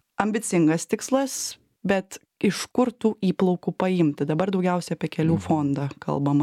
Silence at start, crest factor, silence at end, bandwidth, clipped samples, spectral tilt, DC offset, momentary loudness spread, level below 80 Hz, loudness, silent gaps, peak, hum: 0.2 s; 20 dB; 0 s; 15.5 kHz; under 0.1%; -6 dB/octave; under 0.1%; 6 LU; -62 dBFS; -24 LUFS; none; -4 dBFS; none